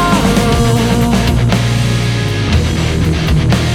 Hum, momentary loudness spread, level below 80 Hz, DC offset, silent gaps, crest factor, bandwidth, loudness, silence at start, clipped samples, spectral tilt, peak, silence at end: none; 3 LU; -20 dBFS; under 0.1%; none; 12 dB; 16 kHz; -13 LUFS; 0 s; under 0.1%; -5.5 dB/octave; 0 dBFS; 0 s